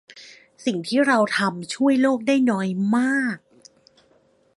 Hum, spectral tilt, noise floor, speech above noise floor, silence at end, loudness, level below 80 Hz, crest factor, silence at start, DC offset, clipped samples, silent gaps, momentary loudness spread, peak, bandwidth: none; -5 dB/octave; -60 dBFS; 40 dB; 1.2 s; -21 LUFS; -72 dBFS; 16 dB; 0.15 s; under 0.1%; under 0.1%; none; 9 LU; -6 dBFS; 11.5 kHz